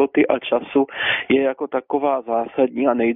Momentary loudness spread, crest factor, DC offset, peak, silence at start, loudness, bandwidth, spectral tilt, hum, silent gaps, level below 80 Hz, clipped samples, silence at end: 4 LU; 16 dB; under 0.1%; -2 dBFS; 0 s; -20 LUFS; 3.9 kHz; -2.5 dB/octave; none; none; -60 dBFS; under 0.1%; 0 s